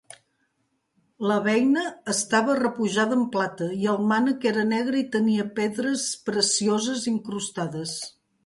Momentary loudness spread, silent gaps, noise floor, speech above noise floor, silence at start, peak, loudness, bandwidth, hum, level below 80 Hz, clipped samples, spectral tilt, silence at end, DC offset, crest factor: 8 LU; none; -73 dBFS; 49 dB; 1.2 s; -8 dBFS; -24 LUFS; 11.5 kHz; none; -70 dBFS; under 0.1%; -3.5 dB/octave; 0.35 s; under 0.1%; 16 dB